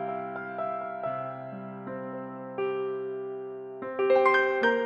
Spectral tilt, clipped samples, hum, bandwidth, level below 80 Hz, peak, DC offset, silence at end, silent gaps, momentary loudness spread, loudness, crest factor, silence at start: -6.5 dB/octave; under 0.1%; none; 7 kHz; -76 dBFS; -10 dBFS; under 0.1%; 0 s; none; 16 LU; -30 LUFS; 20 dB; 0 s